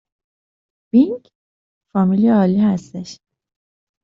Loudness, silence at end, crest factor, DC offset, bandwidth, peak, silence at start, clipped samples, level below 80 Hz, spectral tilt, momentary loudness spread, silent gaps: -16 LUFS; 0.9 s; 16 dB; under 0.1%; 7.6 kHz; -4 dBFS; 0.95 s; under 0.1%; -60 dBFS; -8.5 dB/octave; 18 LU; 1.35-1.81 s